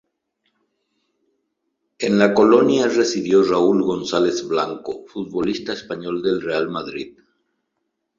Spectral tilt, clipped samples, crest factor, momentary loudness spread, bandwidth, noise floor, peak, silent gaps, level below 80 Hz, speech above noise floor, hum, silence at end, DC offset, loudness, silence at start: -5 dB/octave; under 0.1%; 18 dB; 15 LU; 7.6 kHz; -75 dBFS; -2 dBFS; none; -60 dBFS; 57 dB; none; 1.1 s; under 0.1%; -19 LUFS; 2 s